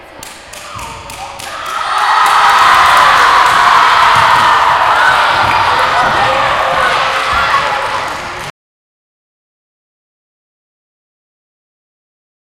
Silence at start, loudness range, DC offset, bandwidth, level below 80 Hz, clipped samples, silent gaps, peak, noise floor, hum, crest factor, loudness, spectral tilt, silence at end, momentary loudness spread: 0 s; 11 LU; under 0.1%; 17.5 kHz; -40 dBFS; 0.2%; none; 0 dBFS; -31 dBFS; none; 12 dB; -9 LUFS; -1.5 dB/octave; 4 s; 19 LU